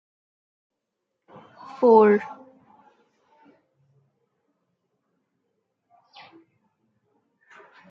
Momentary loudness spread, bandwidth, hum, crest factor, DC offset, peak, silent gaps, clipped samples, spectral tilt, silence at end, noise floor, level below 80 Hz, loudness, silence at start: 28 LU; 5.6 kHz; none; 24 dB; under 0.1%; -4 dBFS; none; under 0.1%; -8.5 dB/octave; 5.55 s; -81 dBFS; -80 dBFS; -18 LUFS; 1.8 s